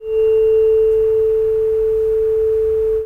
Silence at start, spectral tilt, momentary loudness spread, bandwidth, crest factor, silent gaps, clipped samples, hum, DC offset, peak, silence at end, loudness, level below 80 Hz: 0 s; -7 dB/octave; 3 LU; 3 kHz; 6 dB; none; under 0.1%; none; under 0.1%; -8 dBFS; 0 s; -15 LUFS; -38 dBFS